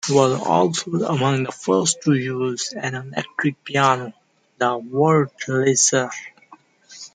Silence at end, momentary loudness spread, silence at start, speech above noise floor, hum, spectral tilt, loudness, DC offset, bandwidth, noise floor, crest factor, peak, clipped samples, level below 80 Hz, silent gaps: 0.05 s; 10 LU; 0.05 s; 31 dB; none; -4 dB/octave; -20 LUFS; under 0.1%; 9.6 kHz; -51 dBFS; 18 dB; -2 dBFS; under 0.1%; -66 dBFS; none